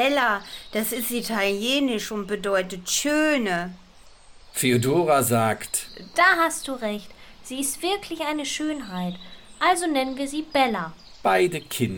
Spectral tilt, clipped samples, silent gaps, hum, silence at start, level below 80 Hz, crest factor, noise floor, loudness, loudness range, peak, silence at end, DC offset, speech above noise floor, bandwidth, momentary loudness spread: -3.5 dB/octave; under 0.1%; none; none; 0 s; -54 dBFS; 18 dB; -48 dBFS; -24 LUFS; 4 LU; -6 dBFS; 0 s; under 0.1%; 25 dB; 18 kHz; 11 LU